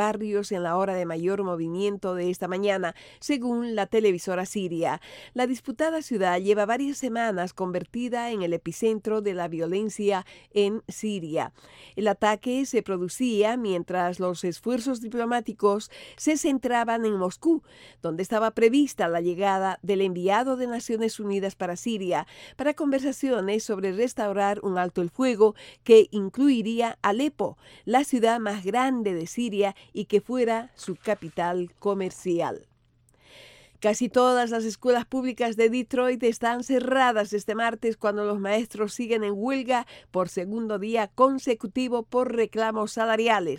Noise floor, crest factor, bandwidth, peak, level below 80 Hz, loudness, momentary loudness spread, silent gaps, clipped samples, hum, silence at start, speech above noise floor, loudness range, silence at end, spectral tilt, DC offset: -63 dBFS; 20 dB; 16.5 kHz; -4 dBFS; -64 dBFS; -26 LUFS; 7 LU; none; under 0.1%; none; 0 s; 38 dB; 5 LU; 0 s; -5 dB/octave; under 0.1%